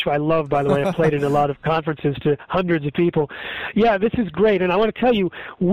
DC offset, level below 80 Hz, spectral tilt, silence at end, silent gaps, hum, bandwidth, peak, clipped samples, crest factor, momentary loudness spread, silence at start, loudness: under 0.1%; -46 dBFS; -8 dB/octave; 0 s; none; none; 13.5 kHz; -6 dBFS; under 0.1%; 14 dB; 6 LU; 0 s; -20 LUFS